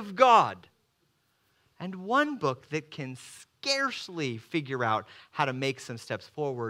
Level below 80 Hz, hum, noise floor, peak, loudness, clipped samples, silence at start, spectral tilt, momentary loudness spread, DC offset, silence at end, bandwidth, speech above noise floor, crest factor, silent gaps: -80 dBFS; none; -72 dBFS; -6 dBFS; -28 LUFS; under 0.1%; 0 s; -4.5 dB/octave; 18 LU; under 0.1%; 0 s; 15.5 kHz; 44 dB; 24 dB; none